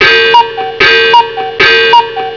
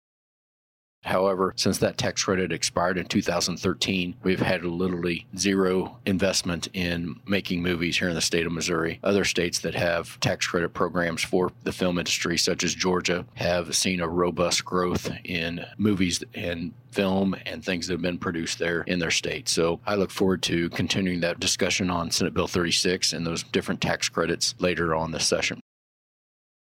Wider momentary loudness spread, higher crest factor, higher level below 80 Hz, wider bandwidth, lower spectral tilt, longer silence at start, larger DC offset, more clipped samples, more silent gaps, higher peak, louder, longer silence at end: about the same, 5 LU vs 5 LU; second, 6 dB vs 20 dB; first, -42 dBFS vs -52 dBFS; second, 5.4 kHz vs 16.5 kHz; about the same, -2.5 dB/octave vs -3.5 dB/octave; second, 0 s vs 1.05 s; first, 0.3% vs under 0.1%; first, 5% vs under 0.1%; neither; first, 0 dBFS vs -6 dBFS; first, -6 LUFS vs -25 LUFS; second, 0 s vs 1 s